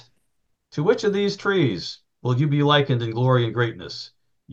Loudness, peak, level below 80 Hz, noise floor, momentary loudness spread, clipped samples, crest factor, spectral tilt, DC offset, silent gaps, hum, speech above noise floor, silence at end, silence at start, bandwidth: -22 LUFS; -4 dBFS; -62 dBFS; -73 dBFS; 16 LU; under 0.1%; 18 dB; -6.5 dB/octave; under 0.1%; none; none; 52 dB; 0 s; 0.75 s; 7.6 kHz